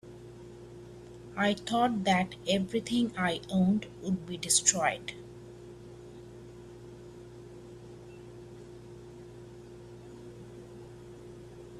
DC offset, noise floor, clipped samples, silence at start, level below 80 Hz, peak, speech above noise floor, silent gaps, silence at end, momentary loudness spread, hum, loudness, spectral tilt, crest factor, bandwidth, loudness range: under 0.1%; -48 dBFS; under 0.1%; 0.05 s; -60 dBFS; -8 dBFS; 19 dB; none; 0 s; 21 LU; none; -29 LUFS; -3.5 dB/octave; 26 dB; 13 kHz; 20 LU